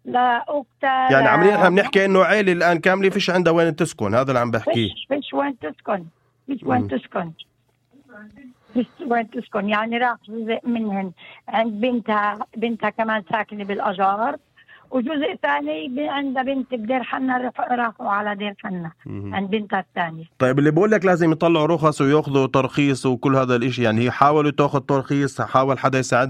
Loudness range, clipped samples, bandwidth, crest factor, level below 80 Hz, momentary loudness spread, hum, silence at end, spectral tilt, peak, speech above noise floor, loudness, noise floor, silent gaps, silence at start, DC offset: 9 LU; under 0.1%; 12.5 kHz; 20 dB; -60 dBFS; 11 LU; none; 0 s; -6 dB/octave; 0 dBFS; 39 dB; -20 LUFS; -59 dBFS; none; 0.05 s; under 0.1%